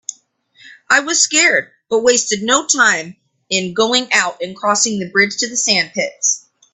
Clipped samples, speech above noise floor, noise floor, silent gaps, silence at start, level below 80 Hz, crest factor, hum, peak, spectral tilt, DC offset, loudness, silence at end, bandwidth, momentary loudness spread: under 0.1%; 36 dB; -52 dBFS; none; 0.1 s; -62 dBFS; 16 dB; none; 0 dBFS; -1 dB/octave; under 0.1%; -14 LUFS; 0.35 s; 9.8 kHz; 9 LU